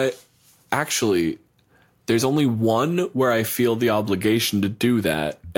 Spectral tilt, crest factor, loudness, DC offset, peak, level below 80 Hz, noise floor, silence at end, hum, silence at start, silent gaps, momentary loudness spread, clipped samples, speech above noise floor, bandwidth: -5 dB/octave; 18 dB; -21 LUFS; under 0.1%; -4 dBFS; -56 dBFS; -59 dBFS; 0.05 s; none; 0 s; none; 6 LU; under 0.1%; 38 dB; 17 kHz